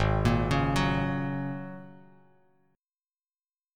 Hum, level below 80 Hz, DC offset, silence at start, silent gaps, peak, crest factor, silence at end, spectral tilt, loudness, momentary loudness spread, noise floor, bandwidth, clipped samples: none; -40 dBFS; under 0.1%; 0 s; none; -10 dBFS; 20 dB; 1.8 s; -6.5 dB/octave; -28 LUFS; 15 LU; under -90 dBFS; 14.5 kHz; under 0.1%